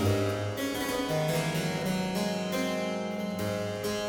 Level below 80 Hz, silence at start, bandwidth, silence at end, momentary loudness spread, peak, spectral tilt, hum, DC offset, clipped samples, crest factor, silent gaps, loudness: -56 dBFS; 0 s; 19.5 kHz; 0 s; 4 LU; -14 dBFS; -5 dB/octave; none; under 0.1%; under 0.1%; 16 dB; none; -31 LUFS